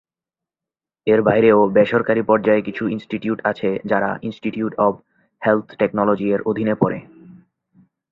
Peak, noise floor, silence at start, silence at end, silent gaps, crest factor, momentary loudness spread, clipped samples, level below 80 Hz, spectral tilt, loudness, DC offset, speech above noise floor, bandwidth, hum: 0 dBFS; -89 dBFS; 1.05 s; 0.75 s; none; 18 dB; 11 LU; under 0.1%; -58 dBFS; -9 dB/octave; -19 LUFS; under 0.1%; 71 dB; 5.2 kHz; none